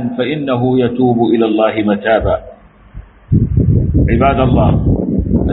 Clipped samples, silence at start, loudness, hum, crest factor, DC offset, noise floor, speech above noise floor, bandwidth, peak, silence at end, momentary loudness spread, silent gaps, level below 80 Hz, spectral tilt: under 0.1%; 0 s; -13 LUFS; none; 12 dB; under 0.1%; -34 dBFS; 22 dB; 4.1 kHz; 0 dBFS; 0 s; 5 LU; none; -24 dBFS; -7.5 dB/octave